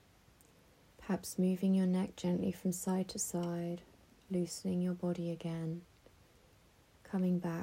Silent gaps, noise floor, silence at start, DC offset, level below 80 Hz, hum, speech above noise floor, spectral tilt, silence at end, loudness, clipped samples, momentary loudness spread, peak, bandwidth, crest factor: none; -66 dBFS; 1 s; under 0.1%; -70 dBFS; none; 30 dB; -6.5 dB/octave; 0 s; -37 LUFS; under 0.1%; 10 LU; -24 dBFS; 16 kHz; 14 dB